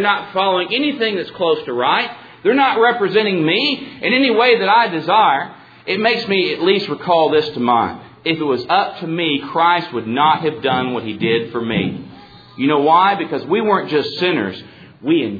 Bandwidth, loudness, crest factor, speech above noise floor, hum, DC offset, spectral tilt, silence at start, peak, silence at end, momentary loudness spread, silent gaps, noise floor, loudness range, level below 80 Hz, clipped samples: 5 kHz; -16 LUFS; 14 dB; 24 dB; none; under 0.1%; -7 dB/octave; 0 s; -2 dBFS; 0 s; 8 LU; none; -40 dBFS; 3 LU; -60 dBFS; under 0.1%